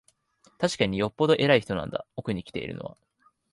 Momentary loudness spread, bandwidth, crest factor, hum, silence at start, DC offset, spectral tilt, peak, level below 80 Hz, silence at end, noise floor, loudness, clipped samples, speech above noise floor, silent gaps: 14 LU; 11.5 kHz; 20 dB; none; 0.6 s; under 0.1%; -5.5 dB/octave; -6 dBFS; -56 dBFS; 0.6 s; -64 dBFS; -26 LUFS; under 0.1%; 38 dB; none